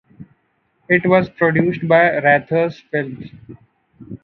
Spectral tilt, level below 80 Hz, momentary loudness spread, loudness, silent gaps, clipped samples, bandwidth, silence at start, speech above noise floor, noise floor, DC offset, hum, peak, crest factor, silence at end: -9 dB/octave; -56 dBFS; 18 LU; -16 LUFS; none; under 0.1%; 6 kHz; 0.2 s; 48 dB; -65 dBFS; under 0.1%; none; 0 dBFS; 18 dB; 0.05 s